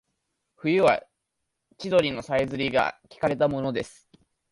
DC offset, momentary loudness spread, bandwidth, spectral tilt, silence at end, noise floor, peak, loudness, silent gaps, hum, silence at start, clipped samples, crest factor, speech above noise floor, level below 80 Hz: under 0.1%; 10 LU; 11.5 kHz; -6 dB/octave; 0.6 s; -80 dBFS; -8 dBFS; -25 LUFS; none; none; 0.65 s; under 0.1%; 18 dB; 56 dB; -58 dBFS